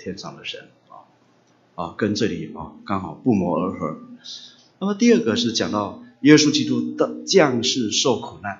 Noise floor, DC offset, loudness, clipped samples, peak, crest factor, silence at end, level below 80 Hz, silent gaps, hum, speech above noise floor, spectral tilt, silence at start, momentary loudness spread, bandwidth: -58 dBFS; under 0.1%; -20 LUFS; under 0.1%; 0 dBFS; 22 dB; 0 s; -60 dBFS; none; none; 37 dB; -4 dB/octave; 0 s; 19 LU; 7.8 kHz